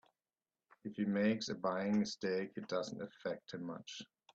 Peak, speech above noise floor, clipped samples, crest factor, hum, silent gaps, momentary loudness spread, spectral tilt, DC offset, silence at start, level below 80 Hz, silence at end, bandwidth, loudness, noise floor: -22 dBFS; over 51 dB; under 0.1%; 18 dB; none; none; 14 LU; -5.5 dB/octave; under 0.1%; 0.85 s; -80 dBFS; 0.3 s; 7.8 kHz; -39 LUFS; under -90 dBFS